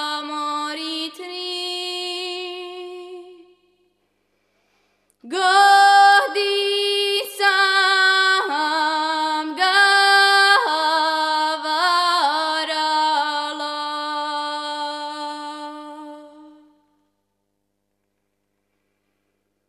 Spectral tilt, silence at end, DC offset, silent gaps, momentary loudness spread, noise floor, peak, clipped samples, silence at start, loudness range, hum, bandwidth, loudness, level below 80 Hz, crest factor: 1.5 dB/octave; 3.2 s; under 0.1%; none; 17 LU; -74 dBFS; -2 dBFS; under 0.1%; 0 s; 16 LU; 50 Hz at -80 dBFS; 14 kHz; -18 LUFS; -84 dBFS; 18 dB